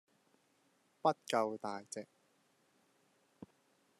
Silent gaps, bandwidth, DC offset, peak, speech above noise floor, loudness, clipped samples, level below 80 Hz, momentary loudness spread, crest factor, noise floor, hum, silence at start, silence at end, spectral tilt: none; 13.5 kHz; under 0.1%; -18 dBFS; 38 dB; -38 LUFS; under 0.1%; under -90 dBFS; 13 LU; 26 dB; -75 dBFS; none; 1.05 s; 0.55 s; -4 dB/octave